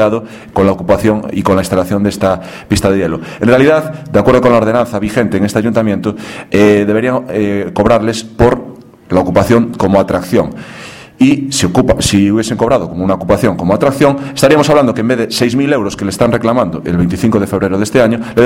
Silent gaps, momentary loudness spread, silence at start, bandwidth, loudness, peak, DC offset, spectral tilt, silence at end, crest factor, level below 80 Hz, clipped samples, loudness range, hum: none; 7 LU; 0 s; 16.5 kHz; -12 LUFS; 0 dBFS; under 0.1%; -6 dB/octave; 0 s; 12 dB; -34 dBFS; 0.4%; 2 LU; none